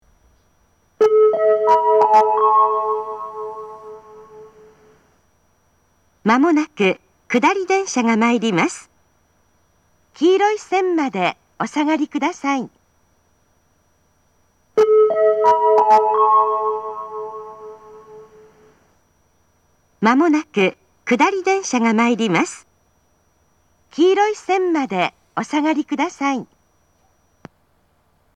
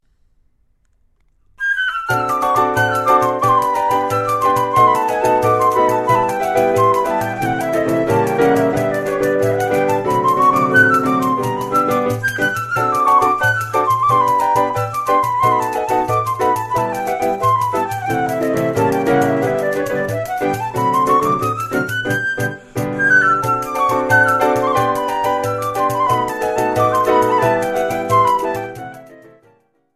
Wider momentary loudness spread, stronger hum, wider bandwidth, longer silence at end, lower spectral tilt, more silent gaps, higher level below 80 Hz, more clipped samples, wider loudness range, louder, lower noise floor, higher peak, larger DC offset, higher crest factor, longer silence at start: first, 16 LU vs 7 LU; neither; second, 9.8 kHz vs 14 kHz; first, 1.9 s vs 0.8 s; about the same, -4.5 dB/octave vs -5.5 dB/octave; neither; second, -68 dBFS vs -50 dBFS; neither; first, 9 LU vs 3 LU; about the same, -17 LUFS vs -16 LUFS; about the same, -61 dBFS vs -59 dBFS; about the same, 0 dBFS vs 0 dBFS; neither; about the same, 18 dB vs 16 dB; second, 1 s vs 1.6 s